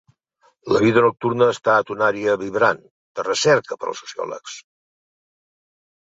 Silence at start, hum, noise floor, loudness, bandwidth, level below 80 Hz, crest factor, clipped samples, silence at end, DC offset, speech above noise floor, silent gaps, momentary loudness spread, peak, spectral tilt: 0.65 s; none; -61 dBFS; -19 LUFS; 8 kHz; -60 dBFS; 20 dB; under 0.1%; 1.4 s; under 0.1%; 42 dB; 2.90-3.15 s; 17 LU; -2 dBFS; -4.5 dB/octave